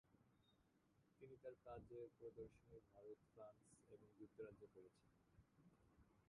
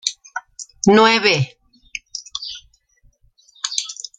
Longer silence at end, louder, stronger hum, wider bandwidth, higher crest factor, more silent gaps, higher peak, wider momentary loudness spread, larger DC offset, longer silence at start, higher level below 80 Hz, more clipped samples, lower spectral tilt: second, 0 s vs 0.25 s; second, -63 LUFS vs -17 LUFS; neither; about the same, 9.6 kHz vs 9.6 kHz; about the same, 18 dB vs 20 dB; neither; second, -46 dBFS vs -2 dBFS; second, 10 LU vs 21 LU; neither; about the same, 0.05 s vs 0.05 s; second, -82 dBFS vs -58 dBFS; neither; first, -7 dB/octave vs -3.5 dB/octave